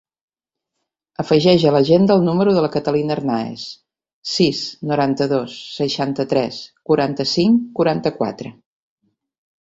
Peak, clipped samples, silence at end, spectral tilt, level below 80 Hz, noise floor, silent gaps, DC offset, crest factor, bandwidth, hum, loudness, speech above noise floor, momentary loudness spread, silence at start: -2 dBFS; under 0.1%; 1.1 s; -6.5 dB/octave; -56 dBFS; -82 dBFS; 4.13-4.22 s; under 0.1%; 18 dB; 8 kHz; none; -18 LUFS; 64 dB; 16 LU; 1.2 s